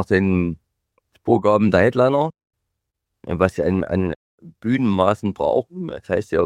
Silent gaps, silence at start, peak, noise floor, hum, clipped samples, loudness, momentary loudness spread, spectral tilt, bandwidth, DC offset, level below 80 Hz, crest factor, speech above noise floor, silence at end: 4.16-4.38 s; 0 s; -2 dBFS; -79 dBFS; none; under 0.1%; -20 LUFS; 14 LU; -8 dB/octave; 11 kHz; under 0.1%; -48 dBFS; 18 dB; 60 dB; 0 s